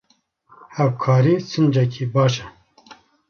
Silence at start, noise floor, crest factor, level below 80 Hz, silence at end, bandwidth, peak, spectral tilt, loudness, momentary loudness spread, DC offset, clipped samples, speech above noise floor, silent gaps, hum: 0.75 s; -61 dBFS; 16 dB; -58 dBFS; 0.35 s; 7 kHz; -6 dBFS; -7.5 dB/octave; -19 LUFS; 6 LU; under 0.1%; under 0.1%; 43 dB; none; none